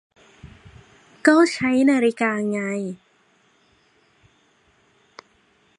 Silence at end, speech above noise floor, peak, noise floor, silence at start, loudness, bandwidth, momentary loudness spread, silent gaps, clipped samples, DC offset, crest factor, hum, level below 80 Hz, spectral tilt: 2.85 s; 42 dB; -2 dBFS; -61 dBFS; 0.45 s; -20 LUFS; 11 kHz; 13 LU; none; under 0.1%; under 0.1%; 22 dB; none; -62 dBFS; -5 dB/octave